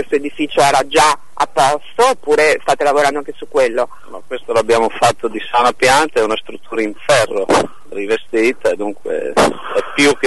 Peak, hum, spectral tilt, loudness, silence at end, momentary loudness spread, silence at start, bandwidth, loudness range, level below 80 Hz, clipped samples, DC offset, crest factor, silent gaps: -2 dBFS; none; -3 dB/octave; -15 LUFS; 0 s; 10 LU; 0 s; 12 kHz; 3 LU; -50 dBFS; under 0.1%; 4%; 14 dB; none